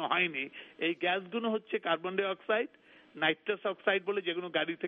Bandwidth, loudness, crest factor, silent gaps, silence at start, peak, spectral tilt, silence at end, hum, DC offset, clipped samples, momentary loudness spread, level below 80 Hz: 4.5 kHz; -33 LUFS; 20 dB; none; 0 s; -14 dBFS; -7 dB/octave; 0 s; none; under 0.1%; under 0.1%; 4 LU; -84 dBFS